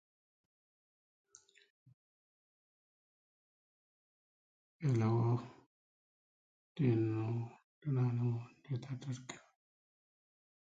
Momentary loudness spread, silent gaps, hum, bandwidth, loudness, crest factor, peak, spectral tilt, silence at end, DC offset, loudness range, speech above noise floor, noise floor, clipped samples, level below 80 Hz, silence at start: 17 LU; 5.66-6.75 s, 7.64-7.81 s; none; 7.8 kHz; -37 LUFS; 20 dB; -22 dBFS; -8.5 dB/octave; 1.25 s; under 0.1%; 4 LU; over 55 dB; under -90 dBFS; under 0.1%; -76 dBFS; 4.8 s